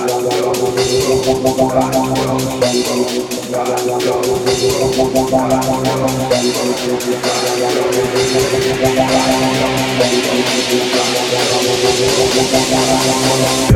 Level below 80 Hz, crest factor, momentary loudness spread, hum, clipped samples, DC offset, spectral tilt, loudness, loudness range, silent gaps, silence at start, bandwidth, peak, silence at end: -38 dBFS; 14 dB; 4 LU; none; under 0.1%; under 0.1%; -4 dB/octave; -14 LUFS; 2 LU; none; 0 s; 17 kHz; 0 dBFS; 0 s